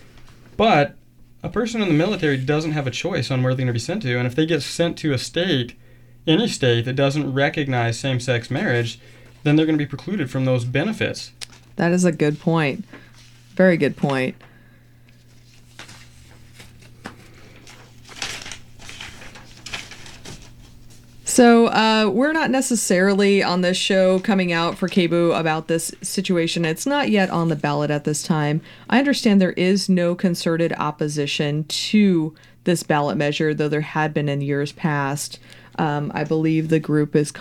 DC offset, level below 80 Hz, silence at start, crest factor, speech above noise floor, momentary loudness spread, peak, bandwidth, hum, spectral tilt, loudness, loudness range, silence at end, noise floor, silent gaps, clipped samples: under 0.1%; -52 dBFS; 0.15 s; 18 dB; 29 dB; 16 LU; -2 dBFS; 16 kHz; none; -5 dB/octave; -20 LUFS; 12 LU; 0 s; -49 dBFS; none; under 0.1%